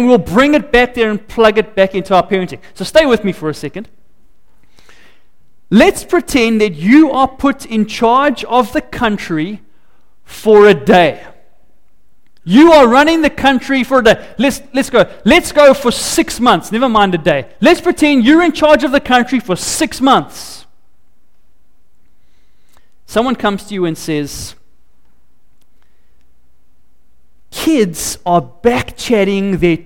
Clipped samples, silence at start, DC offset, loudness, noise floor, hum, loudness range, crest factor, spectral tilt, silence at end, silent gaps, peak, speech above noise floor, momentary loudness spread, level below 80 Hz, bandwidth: under 0.1%; 0 s; 2%; -11 LUFS; -57 dBFS; none; 11 LU; 12 dB; -4.5 dB/octave; 0.05 s; none; 0 dBFS; 46 dB; 11 LU; -38 dBFS; 17 kHz